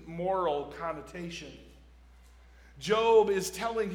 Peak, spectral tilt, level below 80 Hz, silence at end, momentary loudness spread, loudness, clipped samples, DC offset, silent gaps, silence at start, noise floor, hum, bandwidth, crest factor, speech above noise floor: -12 dBFS; -4.5 dB/octave; -56 dBFS; 0 s; 17 LU; -29 LUFS; under 0.1%; under 0.1%; none; 0 s; -55 dBFS; none; 18 kHz; 18 dB; 26 dB